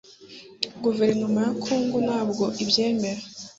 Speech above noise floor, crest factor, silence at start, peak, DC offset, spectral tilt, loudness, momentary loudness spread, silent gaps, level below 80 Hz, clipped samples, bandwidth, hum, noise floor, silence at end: 22 dB; 22 dB; 0.2 s; -4 dBFS; under 0.1%; -4.5 dB/octave; -24 LUFS; 13 LU; none; -64 dBFS; under 0.1%; 8 kHz; none; -46 dBFS; 0.05 s